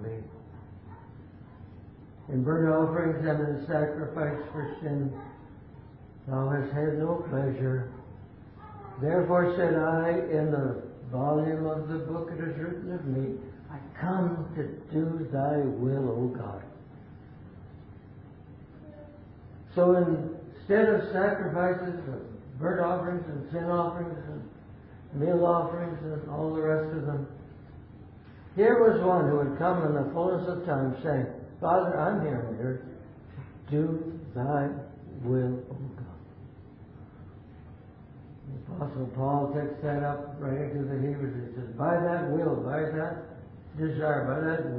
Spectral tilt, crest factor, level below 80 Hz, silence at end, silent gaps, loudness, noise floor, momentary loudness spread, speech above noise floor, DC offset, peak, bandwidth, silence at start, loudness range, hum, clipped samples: -12.5 dB/octave; 20 dB; -56 dBFS; 0 s; none; -29 LUFS; -49 dBFS; 24 LU; 21 dB; under 0.1%; -10 dBFS; 4.8 kHz; 0 s; 7 LU; none; under 0.1%